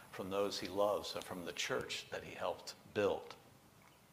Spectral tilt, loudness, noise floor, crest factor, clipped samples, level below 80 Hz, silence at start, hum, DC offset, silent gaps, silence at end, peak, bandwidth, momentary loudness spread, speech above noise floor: -3.5 dB/octave; -40 LUFS; -64 dBFS; 20 dB; under 0.1%; -72 dBFS; 0 s; none; under 0.1%; none; 0.2 s; -22 dBFS; 15.5 kHz; 10 LU; 24 dB